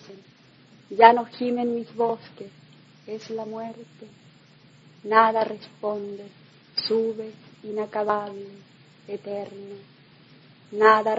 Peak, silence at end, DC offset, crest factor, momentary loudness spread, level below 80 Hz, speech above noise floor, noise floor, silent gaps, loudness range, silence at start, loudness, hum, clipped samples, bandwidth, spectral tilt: 0 dBFS; 0 s; under 0.1%; 26 dB; 24 LU; -76 dBFS; 30 dB; -54 dBFS; none; 9 LU; 0.1 s; -23 LUFS; none; under 0.1%; 7.8 kHz; -5.5 dB/octave